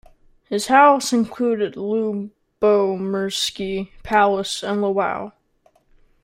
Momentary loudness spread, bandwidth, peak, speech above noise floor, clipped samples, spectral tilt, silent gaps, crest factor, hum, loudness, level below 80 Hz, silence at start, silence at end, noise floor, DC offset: 14 LU; 16 kHz; -2 dBFS; 41 dB; under 0.1%; -4 dB/octave; none; 18 dB; none; -20 LUFS; -52 dBFS; 0.5 s; 0.95 s; -60 dBFS; under 0.1%